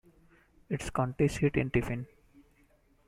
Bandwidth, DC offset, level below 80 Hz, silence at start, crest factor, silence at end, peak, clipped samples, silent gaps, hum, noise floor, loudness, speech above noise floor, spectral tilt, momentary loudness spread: 14.5 kHz; under 0.1%; -50 dBFS; 0.7 s; 20 dB; 1.05 s; -14 dBFS; under 0.1%; none; none; -66 dBFS; -31 LUFS; 36 dB; -7 dB/octave; 11 LU